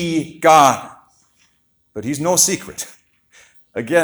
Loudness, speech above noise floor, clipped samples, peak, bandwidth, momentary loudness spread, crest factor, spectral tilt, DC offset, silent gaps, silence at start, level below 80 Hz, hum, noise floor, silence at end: -15 LUFS; 46 dB; under 0.1%; 0 dBFS; over 20 kHz; 20 LU; 18 dB; -3 dB/octave; under 0.1%; none; 0 s; -58 dBFS; none; -62 dBFS; 0 s